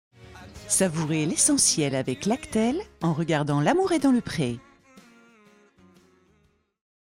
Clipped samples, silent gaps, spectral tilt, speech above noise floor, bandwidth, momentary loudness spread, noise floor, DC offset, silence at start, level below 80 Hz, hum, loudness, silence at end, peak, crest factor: under 0.1%; none; -4 dB/octave; 42 dB; 16.5 kHz; 9 LU; -66 dBFS; under 0.1%; 0.2 s; -58 dBFS; none; -24 LUFS; 2.55 s; -8 dBFS; 20 dB